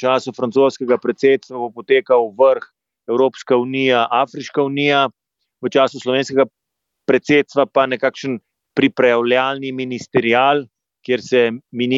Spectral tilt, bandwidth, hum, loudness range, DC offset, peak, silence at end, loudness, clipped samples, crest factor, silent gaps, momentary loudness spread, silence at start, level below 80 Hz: -5.5 dB/octave; 7.8 kHz; none; 1 LU; under 0.1%; -2 dBFS; 0 s; -17 LUFS; under 0.1%; 16 dB; none; 10 LU; 0 s; -66 dBFS